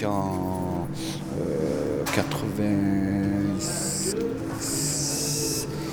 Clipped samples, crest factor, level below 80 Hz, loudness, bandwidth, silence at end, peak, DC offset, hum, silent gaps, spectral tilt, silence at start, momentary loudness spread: under 0.1%; 18 dB; -48 dBFS; -26 LUFS; over 20 kHz; 0 s; -8 dBFS; under 0.1%; none; none; -4.5 dB/octave; 0 s; 5 LU